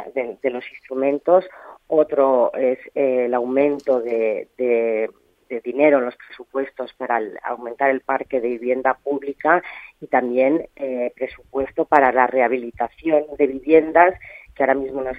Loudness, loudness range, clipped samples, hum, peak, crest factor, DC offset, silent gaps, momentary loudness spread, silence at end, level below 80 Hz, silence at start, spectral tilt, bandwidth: -20 LUFS; 4 LU; under 0.1%; none; 0 dBFS; 20 dB; under 0.1%; none; 13 LU; 0 s; -56 dBFS; 0 s; -7.5 dB/octave; 5.2 kHz